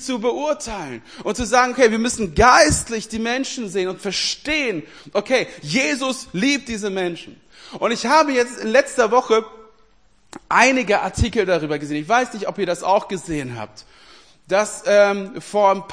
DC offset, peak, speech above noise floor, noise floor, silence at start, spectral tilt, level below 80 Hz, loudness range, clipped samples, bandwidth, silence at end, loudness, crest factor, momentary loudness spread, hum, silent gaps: 0.2%; 0 dBFS; 39 dB; -58 dBFS; 0 s; -3.5 dB/octave; -42 dBFS; 4 LU; under 0.1%; 10.5 kHz; 0 s; -19 LUFS; 20 dB; 12 LU; none; none